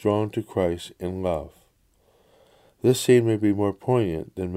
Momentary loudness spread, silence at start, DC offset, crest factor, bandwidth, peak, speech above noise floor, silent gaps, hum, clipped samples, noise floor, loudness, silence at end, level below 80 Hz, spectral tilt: 13 LU; 0.05 s; under 0.1%; 18 dB; 16 kHz; -6 dBFS; 40 dB; none; none; under 0.1%; -63 dBFS; -24 LUFS; 0 s; -52 dBFS; -6.5 dB/octave